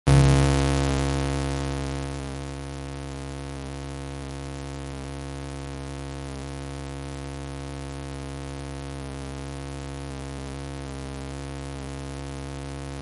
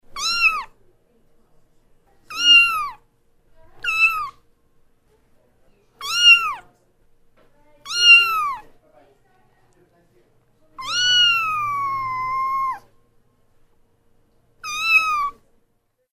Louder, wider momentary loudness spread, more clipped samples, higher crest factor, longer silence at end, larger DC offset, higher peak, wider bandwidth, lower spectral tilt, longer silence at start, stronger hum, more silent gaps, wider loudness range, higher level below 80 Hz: second, -30 LUFS vs -16 LUFS; second, 12 LU vs 21 LU; neither; about the same, 22 dB vs 20 dB; second, 0 s vs 0.85 s; neither; second, -6 dBFS vs -2 dBFS; second, 11.5 kHz vs 15.5 kHz; first, -6 dB/octave vs 2 dB/octave; about the same, 0.05 s vs 0.15 s; neither; neither; about the same, 7 LU vs 8 LU; first, -34 dBFS vs -54 dBFS